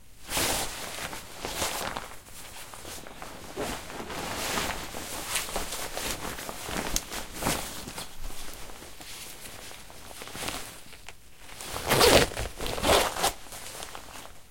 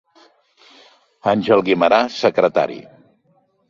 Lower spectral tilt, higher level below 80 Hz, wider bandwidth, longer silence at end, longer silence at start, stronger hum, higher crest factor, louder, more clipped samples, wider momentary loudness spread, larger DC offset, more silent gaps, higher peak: second, -2.5 dB/octave vs -6 dB/octave; first, -44 dBFS vs -60 dBFS; first, 17 kHz vs 7.4 kHz; second, 0 s vs 0.9 s; second, 0.1 s vs 1.25 s; neither; first, 30 dB vs 18 dB; second, -29 LUFS vs -17 LUFS; neither; first, 20 LU vs 10 LU; first, 0.4% vs under 0.1%; neither; about the same, -2 dBFS vs -2 dBFS